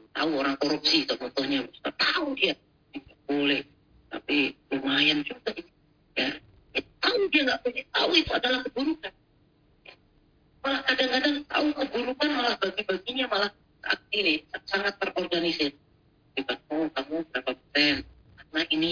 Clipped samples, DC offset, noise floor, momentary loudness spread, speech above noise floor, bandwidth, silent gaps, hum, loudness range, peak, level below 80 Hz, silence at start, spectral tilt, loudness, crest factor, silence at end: under 0.1%; under 0.1%; -63 dBFS; 13 LU; 36 dB; 5.4 kHz; none; none; 3 LU; -8 dBFS; -60 dBFS; 0.15 s; -3.5 dB/octave; -27 LUFS; 22 dB; 0 s